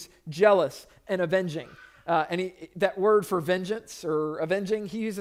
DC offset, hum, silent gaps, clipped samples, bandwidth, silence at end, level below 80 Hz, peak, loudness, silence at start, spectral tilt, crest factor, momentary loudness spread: under 0.1%; none; none; under 0.1%; 16 kHz; 0 s; -66 dBFS; -8 dBFS; -27 LUFS; 0 s; -5.5 dB/octave; 18 dB; 14 LU